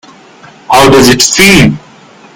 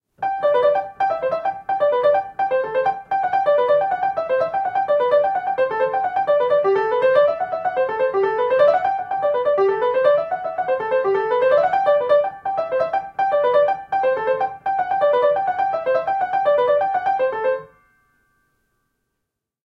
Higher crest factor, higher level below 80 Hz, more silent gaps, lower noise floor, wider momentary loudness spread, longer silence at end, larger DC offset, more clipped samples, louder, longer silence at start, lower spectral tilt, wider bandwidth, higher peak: second, 8 dB vs 16 dB; first, -30 dBFS vs -62 dBFS; neither; second, -36 dBFS vs -80 dBFS; about the same, 7 LU vs 6 LU; second, 0.55 s vs 2 s; neither; first, 5% vs under 0.1%; first, -4 LUFS vs -19 LUFS; first, 0.7 s vs 0.2 s; second, -3.5 dB/octave vs -6 dB/octave; first, over 20 kHz vs 6 kHz; first, 0 dBFS vs -4 dBFS